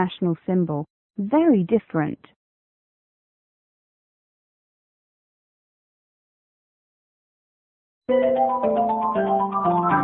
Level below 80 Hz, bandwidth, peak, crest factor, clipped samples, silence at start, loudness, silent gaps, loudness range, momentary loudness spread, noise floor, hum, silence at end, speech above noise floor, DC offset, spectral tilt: -62 dBFS; 4.1 kHz; -8 dBFS; 16 dB; under 0.1%; 0 s; -22 LUFS; 0.90-1.10 s, 2.36-8.01 s; 8 LU; 12 LU; under -90 dBFS; none; 0 s; over 69 dB; under 0.1%; -12 dB/octave